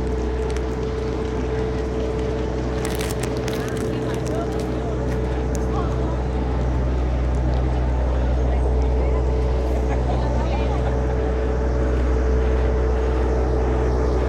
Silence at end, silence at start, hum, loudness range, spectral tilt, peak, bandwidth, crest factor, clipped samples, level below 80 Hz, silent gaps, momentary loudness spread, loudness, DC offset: 0 s; 0 s; none; 3 LU; -7 dB/octave; -6 dBFS; 11.5 kHz; 14 dB; under 0.1%; -22 dBFS; none; 3 LU; -23 LUFS; under 0.1%